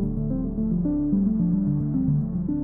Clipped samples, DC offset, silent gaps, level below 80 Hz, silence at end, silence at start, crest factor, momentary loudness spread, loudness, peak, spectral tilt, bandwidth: under 0.1%; under 0.1%; none; -36 dBFS; 0 s; 0 s; 10 dB; 4 LU; -24 LUFS; -12 dBFS; -15 dB/octave; 1.8 kHz